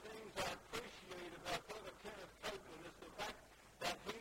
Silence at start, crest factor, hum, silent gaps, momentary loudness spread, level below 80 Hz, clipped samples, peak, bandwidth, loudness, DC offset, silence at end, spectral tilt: 0 s; 22 dB; none; none; 10 LU; -68 dBFS; under 0.1%; -28 dBFS; 16 kHz; -49 LUFS; under 0.1%; 0 s; -2.5 dB/octave